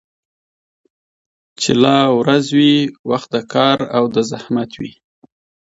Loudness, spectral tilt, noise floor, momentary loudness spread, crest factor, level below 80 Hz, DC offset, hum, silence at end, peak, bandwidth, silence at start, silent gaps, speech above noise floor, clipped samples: -15 LUFS; -5 dB/octave; under -90 dBFS; 9 LU; 16 dB; -58 dBFS; under 0.1%; none; 0.85 s; 0 dBFS; 8 kHz; 1.6 s; 2.99-3.04 s; over 75 dB; under 0.1%